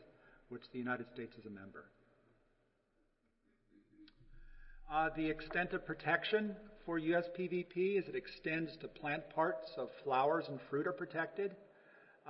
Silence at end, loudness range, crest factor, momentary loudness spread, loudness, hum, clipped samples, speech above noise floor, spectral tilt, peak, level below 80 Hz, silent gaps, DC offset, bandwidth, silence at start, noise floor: 0 s; 11 LU; 22 dB; 15 LU; -39 LUFS; none; under 0.1%; 39 dB; -3.5 dB/octave; -20 dBFS; -64 dBFS; none; under 0.1%; 5.6 kHz; 0 s; -78 dBFS